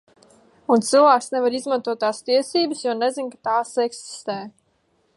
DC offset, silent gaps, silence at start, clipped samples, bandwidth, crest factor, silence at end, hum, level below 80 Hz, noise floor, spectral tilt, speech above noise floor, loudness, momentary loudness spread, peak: under 0.1%; none; 0.7 s; under 0.1%; 11.5 kHz; 18 dB; 0.65 s; none; -76 dBFS; -66 dBFS; -3.5 dB/octave; 45 dB; -21 LUFS; 15 LU; -4 dBFS